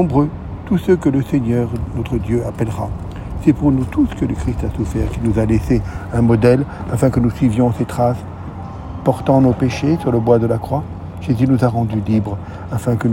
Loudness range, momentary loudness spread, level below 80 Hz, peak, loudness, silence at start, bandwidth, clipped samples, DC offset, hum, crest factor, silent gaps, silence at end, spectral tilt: 3 LU; 11 LU; -32 dBFS; 0 dBFS; -17 LUFS; 0 s; 16.5 kHz; under 0.1%; under 0.1%; none; 16 dB; none; 0 s; -8.5 dB/octave